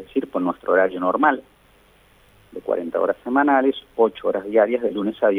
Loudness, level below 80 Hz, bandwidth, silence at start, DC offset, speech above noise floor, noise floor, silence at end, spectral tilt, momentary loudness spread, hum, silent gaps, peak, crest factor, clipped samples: -21 LUFS; -60 dBFS; 10.5 kHz; 0 s; under 0.1%; 34 dB; -55 dBFS; 0 s; -7.5 dB/octave; 8 LU; none; none; -4 dBFS; 16 dB; under 0.1%